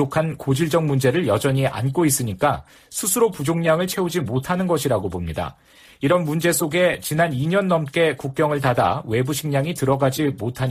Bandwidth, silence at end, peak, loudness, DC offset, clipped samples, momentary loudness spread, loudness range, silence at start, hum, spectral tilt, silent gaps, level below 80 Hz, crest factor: 15.5 kHz; 0 s; -6 dBFS; -21 LUFS; under 0.1%; under 0.1%; 5 LU; 2 LU; 0 s; none; -5 dB/octave; none; -48 dBFS; 16 dB